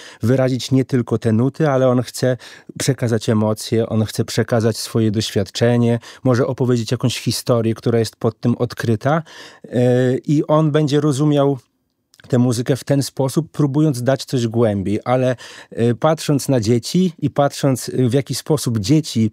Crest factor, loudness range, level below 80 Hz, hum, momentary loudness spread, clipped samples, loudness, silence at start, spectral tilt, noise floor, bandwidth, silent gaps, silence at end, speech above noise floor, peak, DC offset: 16 dB; 2 LU; -56 dBFS; none; 5 LU; under 0.1%; -18 LUFS; 0 s; -6.5 dB/octave; -60 dBFS; 16 kHz; none; 0 s; 43 dB; -2 dBFS; under 0.1%